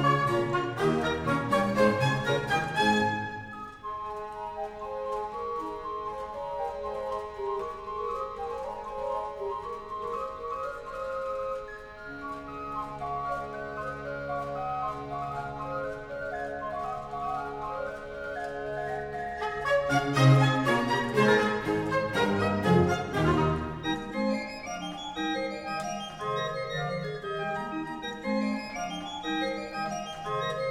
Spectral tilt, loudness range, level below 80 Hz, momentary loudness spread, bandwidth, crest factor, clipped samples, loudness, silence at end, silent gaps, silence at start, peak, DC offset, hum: -6 dB/octave; 10 LU; -52 dBFS; 12 LU; 15 kHz; 20 dB; under 0.1%; -30 LUFS; 0 s; none; 0 s; -10 dBFS; under 0.1%; none